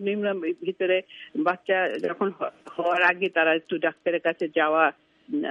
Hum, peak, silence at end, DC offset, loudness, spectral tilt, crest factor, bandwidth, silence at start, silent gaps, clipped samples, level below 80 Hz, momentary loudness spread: none; -6 dBFS; 0 s; under 0.1%; -25 LUFS; -6.5 dB/octave; 20 dB; 8.4 kHz; 0 s; none; under 0.1%; -78 dBFS; 9 LU